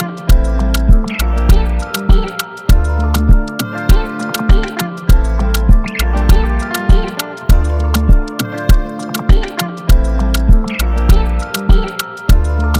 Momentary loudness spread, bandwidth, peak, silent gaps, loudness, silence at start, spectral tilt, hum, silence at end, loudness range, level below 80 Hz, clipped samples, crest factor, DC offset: 6 LU; 16 kHz; 0 dBFS; none; -15 LUFS; 0 s; -6 dB/octave; none; 0 s; 1 LU; -12 dBFS; 0.2%; 10 dB; under 0.1%